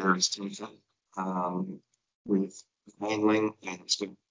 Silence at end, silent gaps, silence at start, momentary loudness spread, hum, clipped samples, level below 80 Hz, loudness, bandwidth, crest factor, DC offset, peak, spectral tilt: 0.15 s; 2.15-2.25 s; 0 s; 18 LU; none; under 0.1%; -78 dBFS; -30 LUFS; 7.6 kHz; 20 dB; under 0.1%; -12 dBFS; -4 dB/octave